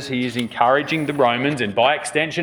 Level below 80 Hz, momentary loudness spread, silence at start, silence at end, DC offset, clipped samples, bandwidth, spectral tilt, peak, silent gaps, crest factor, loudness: -62 dBFS; 5 LU; 0 s; 0 s; under 0.1%; under 0.1%; over 20 kHz; -4.5 dB/octave; 0 dBFS; none; 20 dB; -19 LUFS